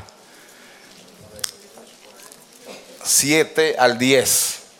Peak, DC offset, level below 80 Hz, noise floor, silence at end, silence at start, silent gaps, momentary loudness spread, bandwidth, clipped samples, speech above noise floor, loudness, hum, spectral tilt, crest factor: -2 dBFS; under 0.1%; -64 dBFS; -47 dBFS; 0.15 s; 0 s; none; 22 LU; 17.5 kHz; under 0.1%; 30 dB; -17 LUFS; none; -2 dB/octave; 20 dB